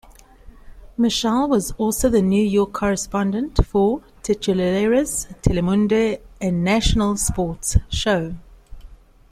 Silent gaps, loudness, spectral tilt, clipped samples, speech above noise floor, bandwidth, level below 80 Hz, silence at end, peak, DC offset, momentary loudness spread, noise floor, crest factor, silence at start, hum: none; -20 LUFS; -5 dB/octave; under 0.1%; 25 dB; 15.5 kHz; -30 dBFS; 0.35 s; -2 dBFS; under 0.1%; 6 LU; -44 dBFS; 18 dB; 0.45 s; none